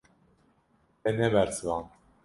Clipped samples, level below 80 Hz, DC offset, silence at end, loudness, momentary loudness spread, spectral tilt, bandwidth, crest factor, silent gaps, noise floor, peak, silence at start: under 0.1%; -56 dBFS; under 0.1%; 0.4 s; -29 LUFS; 10 LU; -5.5 dB/octave; 11.5 kHz; 22 dB; none; -68 dBFS; -10 dBFS; 1.05 s